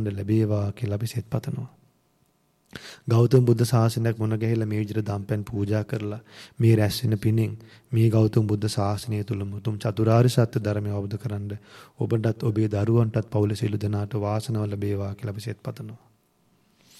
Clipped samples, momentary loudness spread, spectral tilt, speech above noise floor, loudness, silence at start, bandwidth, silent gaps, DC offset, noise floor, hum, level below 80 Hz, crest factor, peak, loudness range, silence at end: under 0.1%; 14 LU; -7.5 dB/octave; 42 dB; -25 LUFS; 0 s; 13.5 kHz; none; under 0.1%; -66 dBFS; none; -58 dBFS; 18 dB; -6 dBFS; 3 LU; 1.05 s